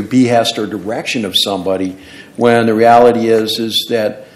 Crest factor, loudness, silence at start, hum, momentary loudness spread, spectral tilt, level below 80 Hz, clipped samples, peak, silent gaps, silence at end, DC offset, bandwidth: 12 dB; -13 LUFS; 0 s; none; 12 LU; -4.5 dB/octave; -54 dBFS; 0.6%; 0 dBFS; none; 0.1 s; under 0.1%; 16.5 kHz